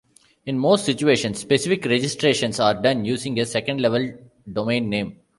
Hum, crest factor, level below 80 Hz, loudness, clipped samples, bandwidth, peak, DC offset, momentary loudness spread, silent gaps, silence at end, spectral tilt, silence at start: none; 18 dB; -58 dBFS; -21 LUFS; under 0.1%; 11.5 kHz; -2 dBFS; under 0.1%; 8 LU; none; 0.25 s; -4.5 dB/octave; 0.45 s